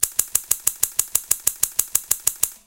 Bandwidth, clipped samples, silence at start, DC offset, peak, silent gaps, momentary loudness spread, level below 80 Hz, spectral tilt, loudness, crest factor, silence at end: over 20 kHz; under 0.1%; 0 s; under 0.1%; 0 dBFS; none; 2 LU; -52 dBFS; 1.5 dB/octave; -20 LUFS; 24 dB; 0.1 s